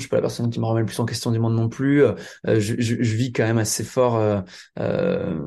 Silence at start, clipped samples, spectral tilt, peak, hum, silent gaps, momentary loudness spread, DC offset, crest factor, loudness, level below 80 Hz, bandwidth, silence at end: 0 s; under 0.1%; -6 dB/octave; -6 dBFS; none; none; 6 LU; under 0.1%; 16 dB; -22 LUFS; -54 dBFS; 12.5 kHz; 0 s